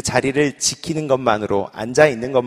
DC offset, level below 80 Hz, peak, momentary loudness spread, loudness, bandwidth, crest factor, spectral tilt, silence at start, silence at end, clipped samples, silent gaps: under 0.1%; -48 dBFS; 0 dBFS; 7 LU; -18 LUFS; 15 kHz; 18 dB; -4 dB/octave; 0.05 s; 0 s; under 0.1%; none